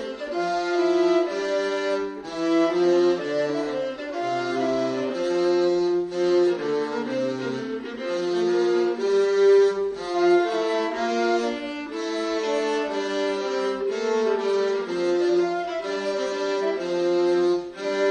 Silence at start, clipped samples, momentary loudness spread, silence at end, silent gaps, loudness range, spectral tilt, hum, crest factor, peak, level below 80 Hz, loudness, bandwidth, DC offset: 0 s; under 0.1%; 8 LU; 0 s; none; 3 LU; -5 dB/octave; none; 14 dB; -10 dBFS; -66 dBFS; -24 LUFS; 9.4 kHz; under 0.1%